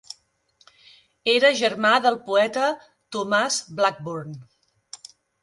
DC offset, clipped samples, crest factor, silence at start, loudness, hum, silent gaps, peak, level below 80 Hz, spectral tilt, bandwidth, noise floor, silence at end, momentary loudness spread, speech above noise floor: under 0.1%; under 0.1%; 20 dB; 1.25 s; -21 LUFS; none; none; -4 dBFS; -72 dBFS; -2.5 dB/octave; 11.5 kHz; -63 dBFS; 0.45 s; 23 LU; 42 dB